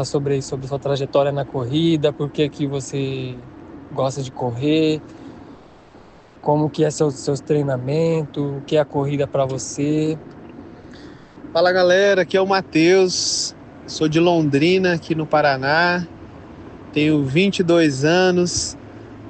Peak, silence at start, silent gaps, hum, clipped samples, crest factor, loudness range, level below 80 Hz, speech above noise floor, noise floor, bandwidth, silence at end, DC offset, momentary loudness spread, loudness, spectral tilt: -4 dBFS; 0 s; none; none; under 0.1%; 16 dB; 6 LU; -52 dBFS; 27 dB; -46 dBFS; 9 kHz; 0 s; under 0.1%; 23 LU; -19 LUFS; -5 dB/octave